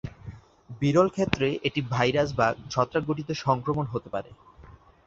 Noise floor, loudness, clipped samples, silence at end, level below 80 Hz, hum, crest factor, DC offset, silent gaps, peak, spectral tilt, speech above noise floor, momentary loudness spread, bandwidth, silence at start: -51 dBFS; -26 LUFS; under 0.1%; 0.3 s; -52 dBFS; none; 24 dB; under 0.1%; none; -2 dBFS; -6 dB/octave; 25 dB; 13 LU; 7.8 kHz; 0.05 s